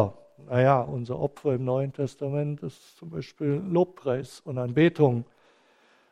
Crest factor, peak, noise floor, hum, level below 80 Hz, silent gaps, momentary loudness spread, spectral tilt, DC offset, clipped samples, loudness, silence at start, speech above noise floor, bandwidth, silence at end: 20 dB; -6 dBFS; -62 dBFS; none; -62 dBFS; none; 16 LU; -8.5 dB/octave; under 0.1%; under 0.1%; -27 LUFS; 0 s; 36 dB; 10.5 kHz; 0.9 s